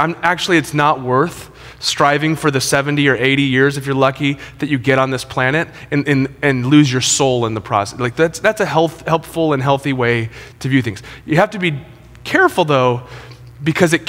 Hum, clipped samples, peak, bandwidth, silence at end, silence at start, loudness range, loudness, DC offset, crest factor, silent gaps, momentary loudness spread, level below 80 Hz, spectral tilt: none; under 0.1%; 0 dBFS; 16.5 kHz; 0 s; 0 s; 2 LU; -15 LUFS; under 0.1%; 16 dB; none; 8 LU; -46 dBFS; -4.5 dB/octave